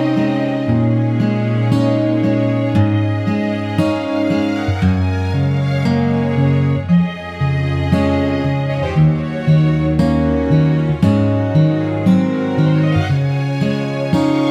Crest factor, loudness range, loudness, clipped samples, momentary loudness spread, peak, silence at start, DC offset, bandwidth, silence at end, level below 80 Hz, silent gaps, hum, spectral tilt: 14 dB; 2 LU; -16 LUFS; under 0.1%; 4 LU; -2 dBFS; 0 s; under 0.1%; 9.4 kHz; 0 s; -36 dBFS; none; none; -8.5 dB/octave